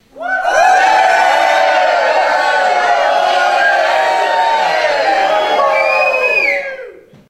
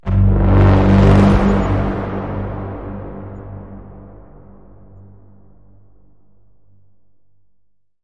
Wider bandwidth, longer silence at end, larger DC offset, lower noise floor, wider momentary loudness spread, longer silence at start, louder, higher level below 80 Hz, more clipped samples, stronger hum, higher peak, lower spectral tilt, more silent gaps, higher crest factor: first, 14.5 kHz vs 7.2 kHz; second, 0.35 s vs 4.05 s; second, under 0.1% vs 0.6%; second, -33 dBFS vs -62 dBFS; second, 4 LU vs 23 LU; about the same, 0.15 s vs 0.05 s; first, -11 LUFS vs -14 LUFS; second, -54 dBFS vs -24 dBFS; neither; second, none vs 50 Hz at -40 dBFS; about the same, 0 dBFS vs 0 dBFS; second, -1 dB/octave vs -9 dB/octave; neither; about the same, 12 dB vs 16 dB